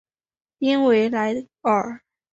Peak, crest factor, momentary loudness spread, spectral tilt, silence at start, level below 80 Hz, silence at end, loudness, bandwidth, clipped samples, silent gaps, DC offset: -8 dBFS; 14 dB; 11 LU; -6 dB/octave; 0.6 s; -66 dBFS; 0.35 s; -21 LUFS; 8 kHz; under 0.1%; none; under 0.1%